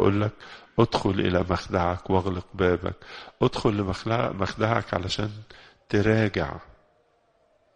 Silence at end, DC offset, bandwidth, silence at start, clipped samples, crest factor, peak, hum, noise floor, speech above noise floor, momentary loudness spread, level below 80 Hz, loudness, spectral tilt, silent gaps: 1.05 s; under 0.1%; 9.6 kHz; 0 s; under 0.1%; 22 dB; -4 dBFS; none; -65 dBFS; 40 dB; 11 LU; -46 dBFS; -26 LUFS; -6.5 dB/octave; none